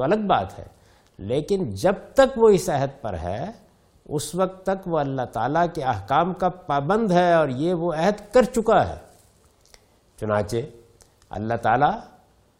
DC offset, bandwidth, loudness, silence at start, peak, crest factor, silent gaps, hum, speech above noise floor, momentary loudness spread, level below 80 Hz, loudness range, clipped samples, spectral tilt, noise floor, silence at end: under 0.1%; 16.5 kHz; -22 LUFS; 0 s; -4 dBFS; 18 dB; none; none; 35 dB; 14 LU; -48 dBFS; 5 LU; under 0.1%; -6 dB/octave; -57 dBFS; 0.55 s